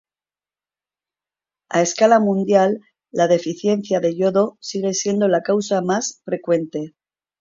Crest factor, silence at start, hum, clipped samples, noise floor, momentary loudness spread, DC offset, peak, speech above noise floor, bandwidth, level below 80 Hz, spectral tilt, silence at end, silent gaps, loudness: 18 dB; 1.7 s; 50 Hz at -45 dBFS; under 0.1%; under -90 dBFS; 11 LU; under 0.1%; -2 dBFS; over 72 dB; 7.6 kHz; -68 dBFS; -5 dB/octave; 0.55 s; none; -19 LUFS